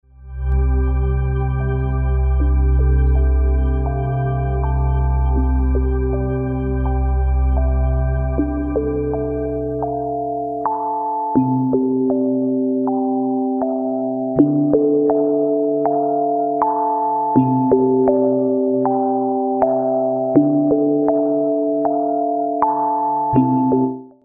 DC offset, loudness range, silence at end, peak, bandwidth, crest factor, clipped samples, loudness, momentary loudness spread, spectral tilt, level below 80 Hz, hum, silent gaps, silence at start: under 0.1%; 3 LU; 0.15 s; 0 dBFS; 2.5 kHz; 16 dB; under 0.1%; -18 LUFS; 6 LU; -13.5 dB/octave; -22 dBFS; none; none; 0.2 s